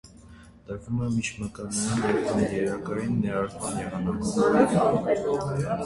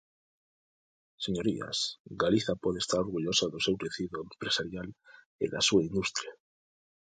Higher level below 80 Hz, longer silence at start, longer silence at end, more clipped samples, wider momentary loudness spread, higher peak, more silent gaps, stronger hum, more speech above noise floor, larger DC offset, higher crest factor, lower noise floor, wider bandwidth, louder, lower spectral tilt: first, -50 dBFS vs -60 dBFS; second, 0.05 s vs 1.2 s; second, 0 s vs 0.65 s; neither; about the same, 10 LU vs 11 LU; first, -8 dBFS vs -12 dBFS; second, none vs 2.00-2.05 s, 5.26-5.39 s; neither; second, 23 dB vs over 59 dB; neither; about the same, 18 dB vs 20 dB; second, -49 dBFS vs under -90 dBFS; first, 11.5 kHz vs 9.6 kHz; first, -26 LUFS vs -31 LUFS; first, -6 dB/octave vs -3.5 dB/octave